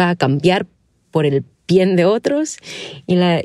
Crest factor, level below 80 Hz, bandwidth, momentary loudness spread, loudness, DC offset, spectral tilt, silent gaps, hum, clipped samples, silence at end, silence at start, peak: 14 dB; -56 dBFS; 12 kHz; 15 LU; -17 LUFS; under 0.1%; -6 dB/octave; none; none; under 0.1%; 0 s; 0 s; -2 dBFS